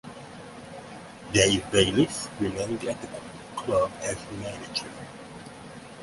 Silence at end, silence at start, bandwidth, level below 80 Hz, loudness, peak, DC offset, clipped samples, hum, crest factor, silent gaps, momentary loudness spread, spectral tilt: 0 s; 0.05 s; 11.5 kHz; -52 dBFS; -26 LUFS; -6 dBFS; under 0.1%; under 0.1%; none; 24 dB; none; 21 LU; -3.5 dB/octave